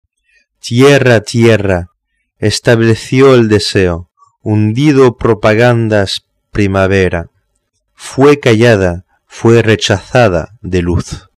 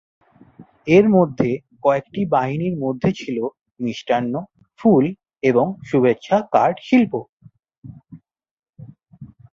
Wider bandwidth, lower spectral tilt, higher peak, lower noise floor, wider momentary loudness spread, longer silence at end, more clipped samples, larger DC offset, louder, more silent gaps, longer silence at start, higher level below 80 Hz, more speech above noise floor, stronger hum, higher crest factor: first, 13 kHz vs 7.4 kHz; second, -6 dB/octave vs -8 dB/octave; about the same, 0 dBFS vs -2 dBFS; first, -64 dBFS vs -47 dBFS; about the same, 11 LU vs 11 LU; about the same, 0.2 s vs 0.3 s; neither; neither; first, -10 LUFS vs -19 LUFS; second, none vs 7.29-7.37 s, 7.78-7.82 s, 8.51-8.63 s; about the same, 0.65 s vs 0.6 s; first, -36 dBFS vs -56 dBFS; first, 55 dB vs 29 dB; neither; second, 10 dB vs 18 dB